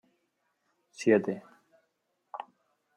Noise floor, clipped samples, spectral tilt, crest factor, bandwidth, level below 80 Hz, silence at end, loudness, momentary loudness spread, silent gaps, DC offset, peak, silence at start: -78 dBFS; under 0.1%; -6 dB/octave; 22 dB; 10.5 kHz; -82 dBFS; 0.55 s; -28 LUFS; 20 LU; none; under 0.1%; -12 dBFS; 1 s